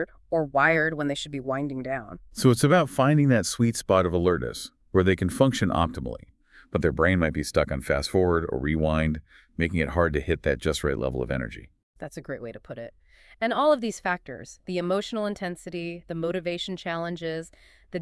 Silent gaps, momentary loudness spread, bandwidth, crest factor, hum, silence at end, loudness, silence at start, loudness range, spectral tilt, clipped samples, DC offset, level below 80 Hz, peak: 11.83-11.93 s; 16 LU; 12 kHz; 20 dB; none; 0 s; -25 LUFS; 0 s; 7 LU; -6 dB/octave; under 0.1%; under 0.1%; -44 dBFS; -6 dBFS